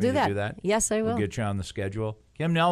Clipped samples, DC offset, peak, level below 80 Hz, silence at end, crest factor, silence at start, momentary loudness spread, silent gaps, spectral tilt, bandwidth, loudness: under 0.1%; under 0.1%; -12 dBFS; -52 dBFS; 0 s; 14 dB; 0 s; 8 LU; none; -5 dB/octave; 16 kHz; -27 LUFS